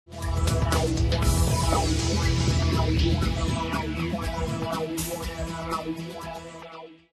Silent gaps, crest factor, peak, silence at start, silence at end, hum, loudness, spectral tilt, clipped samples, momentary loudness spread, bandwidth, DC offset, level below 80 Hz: none; 16 dB; -10 dBFS; 0.1 s; 0.2 s; none; -26 LUFS; -5 dB/octave; under 0.1%; 13 LU; 13 kHz; under 0.1%; -32 dBFS